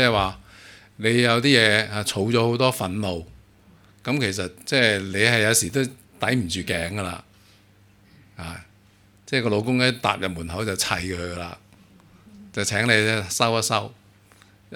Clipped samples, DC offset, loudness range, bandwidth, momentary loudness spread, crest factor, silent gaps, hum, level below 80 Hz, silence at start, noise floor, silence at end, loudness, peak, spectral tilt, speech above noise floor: under 0.1%; under 0.1%; 7 LU; 18 kHz; 16 LU; 22 dB; none; none; -52 dBFS; 0 s; -55 dBFS; 0 s; -22 LUFS; -2 dBFS; -3.5 dB/octave; 33 dB